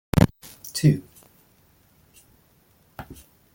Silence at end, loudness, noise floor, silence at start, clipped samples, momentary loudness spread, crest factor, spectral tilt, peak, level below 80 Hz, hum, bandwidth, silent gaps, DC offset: 0.4 s; -23 LUFS; -60 dBFS; 0.15 s; under 0.1%; 24 LU; 26 dB; -6.5 dB/octave; -2 dBFS; -42 dBFS; none; 17 kHz; none; under 0.1%